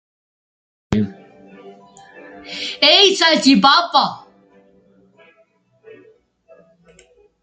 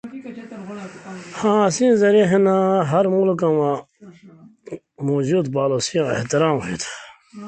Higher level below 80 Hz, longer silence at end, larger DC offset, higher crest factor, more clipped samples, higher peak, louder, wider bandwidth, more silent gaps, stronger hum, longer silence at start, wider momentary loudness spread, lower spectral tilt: first, -52 dBFS vs -60 dBFS; first, 3.25 s vs 0 s; neither; first, 20 dB vs 14 dB; neither; first, 0 dBFS vs -4 dBFS; first, -13 LUFS vs -19 LUFS; about the same, 9.4 kHz vs 9.2 kHz; neither; neither; first, 0.9 s vs 0.05 s; second, 17 LU vs 20 LU; second, -3.5 dB/octave vs -5.5 dB/octave